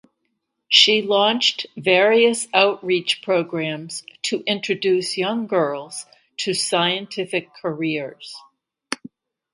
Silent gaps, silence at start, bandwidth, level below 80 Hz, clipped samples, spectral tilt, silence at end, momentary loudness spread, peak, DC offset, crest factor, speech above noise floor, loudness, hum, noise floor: none; 0.7 s; 11.5 kHz; -72 dBFS; under 0.1%; -3 dB/octave; 0.6 s; 17 LU; 0 dBFS; under 0.1%; 22 dB; 54 dB; -19 LUFS; none; -74 dBFS